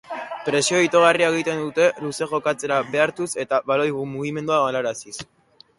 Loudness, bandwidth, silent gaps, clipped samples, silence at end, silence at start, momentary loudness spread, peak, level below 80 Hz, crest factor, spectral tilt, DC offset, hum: -21 LUFS; 11.5 kHz; none; under 0.1%; 0.55 s; 0.1 s; 12 LU; -2 dBFS; -64 dBFS; 18 dB; -3.5 dB/octave; under 0.1%; none